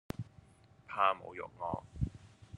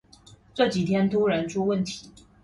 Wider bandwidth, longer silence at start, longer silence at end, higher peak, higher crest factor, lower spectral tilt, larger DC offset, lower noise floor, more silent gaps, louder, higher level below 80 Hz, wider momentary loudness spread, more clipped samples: about the same, 11.5 kHz vs 11.5 kHz; second, 0.2 s vs 0.55 s; second, 0 s vs 0.35 s; second, -14 dBFS vs -8 dBFS; first, 24 dB vs 18 dB; about the same, -6.5 dB/octave vs -6 dB/octave; neither; first, -62 dBFS vs -53 dBFS; neither; second, -37 LUFS vs -25 LUFS; about the same, -54 dBFS vs -58 dBFS; first, 16 LU vs 12 LU; neither